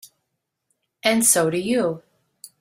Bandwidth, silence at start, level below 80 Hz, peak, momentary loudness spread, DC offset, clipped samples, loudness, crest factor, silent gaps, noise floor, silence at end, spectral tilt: 16 kHz; 1.05 s; -64 dBFS; -2 dBFS; 10 LU; under 0.1%; under 0.1%; -19 LUFS; 22 dB; none; -78 dBFS; 0.15 s; -3 dB/octave